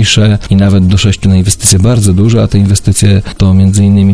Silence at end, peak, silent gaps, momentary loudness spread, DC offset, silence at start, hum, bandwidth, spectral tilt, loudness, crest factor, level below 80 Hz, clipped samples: 0 s; 0 dBFS; none; 2 LU; 3%; 0 s; none; 11 kHz; -5.5 dB/octave; -8 LUFS; 6 dB; -26 dBFS; 2%